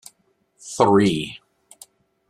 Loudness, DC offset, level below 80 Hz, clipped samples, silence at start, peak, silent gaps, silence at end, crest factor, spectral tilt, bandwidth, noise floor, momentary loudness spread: -19 LUFS; under 0.1%; -58 dBFS; under 0.1%; 0.65 s; -2 dBFS; none; 0.95 s; 22 dB; -5.5 dB/octave; 14 kHz; -65 dBFS; 26 LU